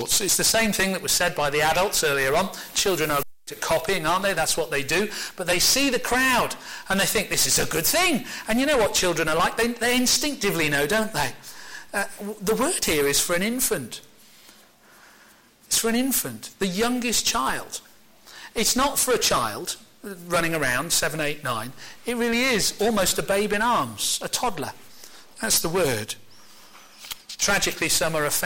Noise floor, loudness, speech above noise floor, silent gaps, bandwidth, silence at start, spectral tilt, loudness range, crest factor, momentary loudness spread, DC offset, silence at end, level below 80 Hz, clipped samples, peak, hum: -54 dBFS; -22 LUFS; 30 dB; none; 17 kHz; 0 s; -2 dB/octave; 4 LU; 14 dB; 12 LU; under 0.1%; 0 s; -46 dBFS; under 0.1%; -10 dBFS; none